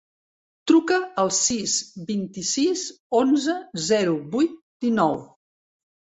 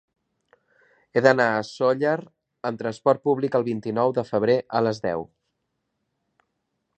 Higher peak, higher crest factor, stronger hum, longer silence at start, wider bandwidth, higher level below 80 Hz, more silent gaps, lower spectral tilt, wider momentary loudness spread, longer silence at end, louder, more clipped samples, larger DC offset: second, -6 dBFS vs -2 dBFS; second, 18 dB vs 24 dB; neither; second, 0.65 s vs 1.15 s; about the same, 8.4 kHz vs 8.8 kHz; about the same, -64 dBFS vs -66 dBFS; first, 3.00-3.10 s, 4.62-4.80 s vs none; second, -3.5 dB/octave vs -6.5 dB/octave; about the same, 9 LU vs 10 LU; second, 0.8 s vs 1.75 s; about the same, -23 LUFS vs -23 LUFS; neither; neither